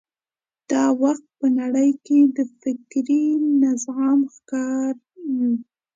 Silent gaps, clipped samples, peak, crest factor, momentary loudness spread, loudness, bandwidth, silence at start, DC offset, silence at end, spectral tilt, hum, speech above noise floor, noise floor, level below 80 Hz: none; under 0.1%; -6 dBFS; 14 dB; 9 LU; -21 LUFS; 7.8 kHz; 0.7 s; under 0.1%; 0.35 s; -5 dB/octave; none; over 70 dB; under -90 dBFS; -76 dBFS